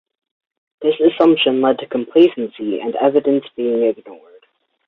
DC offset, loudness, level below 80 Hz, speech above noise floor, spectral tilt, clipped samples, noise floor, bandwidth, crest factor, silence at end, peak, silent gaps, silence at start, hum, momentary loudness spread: under 0.1%; -16 LUFS; -64 dBFS; 42 dB; -7.5 dB/octave; under 0.1%; -57 dBFS; 4.3 kHz; 16 dB; 0.7 s; -2 dBFS; none; 0.8 s; none; 9 LU